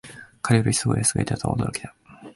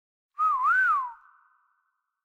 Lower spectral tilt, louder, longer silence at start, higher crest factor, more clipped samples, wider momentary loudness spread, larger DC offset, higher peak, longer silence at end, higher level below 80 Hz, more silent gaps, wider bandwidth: first, -4.5 dB/octave vs 2 dB/octave; about the same, -23 LUFS vs -24 LUFS; second, 0.05 s vs 0.4 s; first, 18 dB vs 12 dB; neither; first, 16 LU vs 8 LU; neither; first, -6 dBFS vs -16 dBFS; second, 0.05 s vs 1.1 s; first, -46 dBFS vs -70 dBFS; neither; about the same, 11.5 kHz vs 12.5 kHz